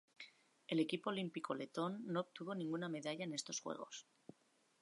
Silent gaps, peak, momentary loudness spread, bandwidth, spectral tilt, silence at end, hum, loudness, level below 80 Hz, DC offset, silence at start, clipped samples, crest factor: none; -26 dBFS; 18 LU; 11.5 kHz; -4.5 dB/octave; 0.8 s; none; -44 LUFS; under -90 dBFS; under 0.1%; 0.2 s; under 0.1%; 20 dB